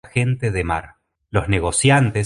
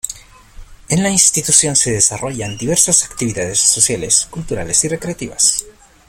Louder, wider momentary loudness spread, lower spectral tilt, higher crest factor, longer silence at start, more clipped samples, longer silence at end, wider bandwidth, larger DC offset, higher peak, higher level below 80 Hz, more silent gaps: second, -19 LUFS vs -13 LUFS; second, 9 LU vs 12 LU; first, -5 dB/octave vs -2.5 dB/octave; about the same, 18 dB vs 16 dB; about the same, 0.05 s vs 0.05 s; neither; second, 0 s vs 0.4 s; second, 11.5 kHz vs over 20 kHz; neither; about the same, -2 dBFS vs 0 dBFS; first, -36 dBFS vs -42 dBFS; neither